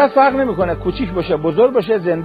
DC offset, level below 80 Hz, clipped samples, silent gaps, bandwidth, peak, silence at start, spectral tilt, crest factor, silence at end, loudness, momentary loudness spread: under 0.1%; -36 dBFS; under 0.1%; none; 5 kHz; 0 dBFS; 0 s; -8.5 dB/octave; 14 dB; 0 s; -16 LUFS; 7 LU